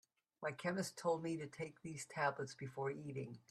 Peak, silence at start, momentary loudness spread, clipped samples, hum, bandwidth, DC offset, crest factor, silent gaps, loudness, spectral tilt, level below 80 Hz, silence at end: -24 dBFS; 0.4 s; 8 LU; under 0.1%; none; 14 kHz; under 0.1%; 20 dB; none; -44 LUFS; -5 dB/octave; -82 dBFS; 0.1 s